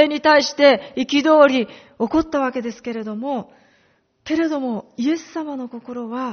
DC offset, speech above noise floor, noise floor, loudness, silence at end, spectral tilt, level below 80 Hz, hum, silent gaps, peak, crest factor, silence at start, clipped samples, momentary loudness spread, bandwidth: under 0.1%; 42 dB; -61 dBFS; -19 LUFS; 0 s; -2 dB/octave; -54 dBFS; none; none; 0 dBFS; 18 dB; 0 s; under 0.1%; 16 LU; 6.6 kHz